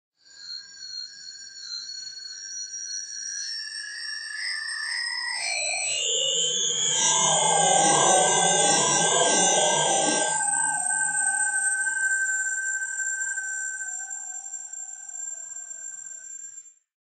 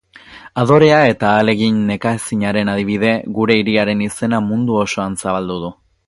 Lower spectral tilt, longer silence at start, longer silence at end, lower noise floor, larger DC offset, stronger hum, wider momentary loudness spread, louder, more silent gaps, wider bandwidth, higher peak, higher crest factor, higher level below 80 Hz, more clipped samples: second, 0 dB/octave vs -5.5 dB/octave; about the same, 0.35 s vs 0.3 s; about the same, 0.35 s vs 0.35 s; first, -46 dBFS vs -40 dBFS; neither; neither; first, 17 LU vs 9 LU; second, -23 LUFS vs -15 LUFS; neither; second, 9 kHz vs 11.5 kHz; second, -6 dBFS vs 0 dBFS; about the same, 20 dB vs 16 dB; second, -84 dBFS vs -48 dBFS; neither